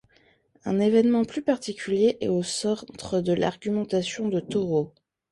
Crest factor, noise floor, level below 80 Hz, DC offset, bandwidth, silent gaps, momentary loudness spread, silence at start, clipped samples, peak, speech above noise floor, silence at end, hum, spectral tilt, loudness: 16 dB; -62 dBFS; -62 dBFS; under 0.1%; 11.5 kHz; none; 8 LU; 0.65 s; under 0.1%; -8 dBFS; 38 dB; 0.45 s; none; -5.5 dB/octave; -25 LUFS